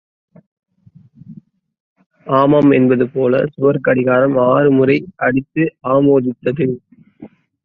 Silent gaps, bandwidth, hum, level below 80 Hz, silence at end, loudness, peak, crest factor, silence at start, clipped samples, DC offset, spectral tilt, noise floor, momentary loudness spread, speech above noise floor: 1.80-1.96 s, 2.06-2.10 s; 5 kHz; none; -54 dBFS; 0.4 s; -14 LUFS; -2 dBFS; 14 dB; 1.3 s; under 0.1%; under 0.1%; -10.5 dB/octave; -48 dBFS; 8 LU; 34 dB